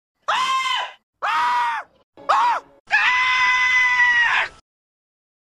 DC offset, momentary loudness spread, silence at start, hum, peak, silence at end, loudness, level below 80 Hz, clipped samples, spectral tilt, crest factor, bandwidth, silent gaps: under 0.1%; 13 LU; 0.3 s; none; -6 dBFS; 0.9 s; -18 LUFS; -60 dBFS; under 0.1%; 1 dB/octave; 14 dB; 13.5 kHz; 1.03-1.13 s, 2.03-2.13 s, 2.80-2.85 s